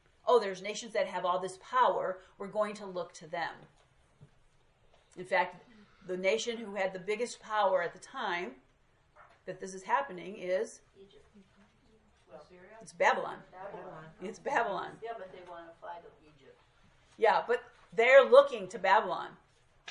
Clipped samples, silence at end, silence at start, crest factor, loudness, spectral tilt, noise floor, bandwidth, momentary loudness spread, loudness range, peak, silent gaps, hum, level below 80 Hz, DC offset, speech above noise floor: under 0.1%; 0 s; 0.25 s; 26 dB; -31 LUFS; -3.5 dB/octave; -68 dBFS; 11 kHz; 19 LU; 12 LU; -8 dBFS; none; none; -72 dBFS; under 0.1%; 36 dB